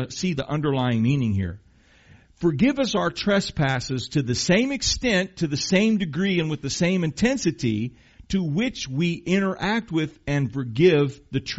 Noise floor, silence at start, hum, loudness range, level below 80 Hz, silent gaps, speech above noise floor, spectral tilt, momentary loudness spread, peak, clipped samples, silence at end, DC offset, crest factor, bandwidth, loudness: -54 dBFS; 0 s; none; 2 LU; -46 dBFS; none; 31 dB; -5 dB/octave; 6 LU; -6 dBFS; under 0.1%; 0 s; under 0.1%; 18 dB; 8 kHz; -23 LUFS